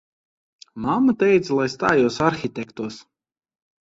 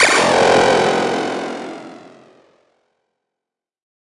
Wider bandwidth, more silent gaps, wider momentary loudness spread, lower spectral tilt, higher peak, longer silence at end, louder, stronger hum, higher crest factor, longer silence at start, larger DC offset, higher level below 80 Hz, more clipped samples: second, 8 kHz vs 11.5 kHz; neither; second, 13 LU vs 18 LU; first, -6 dB/octave vs -3 dB/octave; about the same, -4 dBFS vs -2 dBFS; second, 0.8 s vs 1.95 s; second, -20 LUFS vs -15 LUFS; neither; about the same, 18 dB vs 18 dB; first, 0.75 s vs 0 s; neither; about the same, -56 dBFS vs -54 dBFS; neither